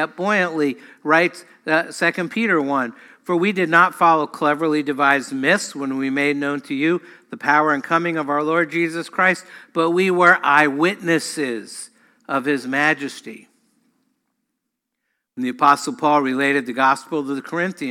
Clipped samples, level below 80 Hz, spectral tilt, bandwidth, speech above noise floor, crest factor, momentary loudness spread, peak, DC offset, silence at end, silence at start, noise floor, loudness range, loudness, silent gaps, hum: under 0.1%; -74 dBFS; -4.5 dB/octave; 16 kHz; 59 dB; 18 dB; 12 LU; -2 dBFS; under 0.1%; 0 s; 0 s; -78 dBFS; 7 LU; -19 LUFS; none; none